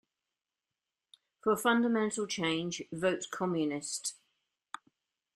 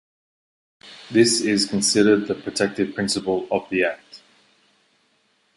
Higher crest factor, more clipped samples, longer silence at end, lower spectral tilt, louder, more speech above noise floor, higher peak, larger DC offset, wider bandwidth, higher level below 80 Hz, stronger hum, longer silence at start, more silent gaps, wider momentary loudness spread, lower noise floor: about the same, 22 dB vs 20 dB; neither; second, 1.2 s vs 1.4 s; about the same, -4 dB/octave vs -3.5 dB/octave; second, -32 LUFS vs -20 LUFS; first, over 58 dB vs 44 dB; second, -14 dBFS vs -4 dBFS; neither; first, 13.5 kHz vs 11.5 kHz; second, -76 dBFS vs -60 dBFS; neither; first, 1.45 s vs 0.85 s; neither; first, 18 LU vs 8 LU; first, under -90 dBFS vs -65 dBFS